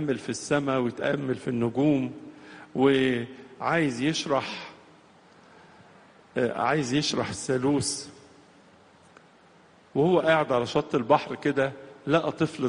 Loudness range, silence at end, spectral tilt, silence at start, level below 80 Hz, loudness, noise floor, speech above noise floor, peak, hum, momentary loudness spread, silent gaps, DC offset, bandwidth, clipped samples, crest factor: 4 LU; 0 s; -5 dB/octave; 0 s; -62 dBFS; -26 LUFS; -56 dBFS; 31 dB; -6 dBFS; none; 13 LU; none; under 0.1%; 10 kHz; under 0.1%; 20 dB